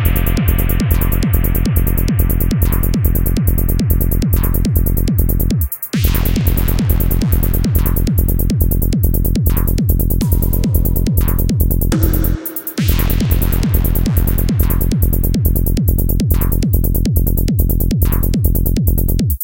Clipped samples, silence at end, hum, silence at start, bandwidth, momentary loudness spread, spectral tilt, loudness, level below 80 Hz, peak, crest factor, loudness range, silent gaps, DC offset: under 0.1%; 0 s; none; 0 s; 17.5 kHz; 1 LU; -6.5 dB/octave; -15 LUFS; -16 dBFS; 0 dBFS; 14 dB; 0 LU; none; 2%